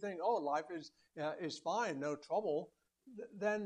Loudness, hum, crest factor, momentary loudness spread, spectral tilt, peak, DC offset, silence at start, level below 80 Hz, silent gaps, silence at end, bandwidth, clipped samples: -40 LUFS; none; 18 dB; 16 LU; -5 dB/octave; -22 dBFS; under 0.1%; 0 s; -86 dBFS; none; 0 s; 10.5 kHz; under 0.1%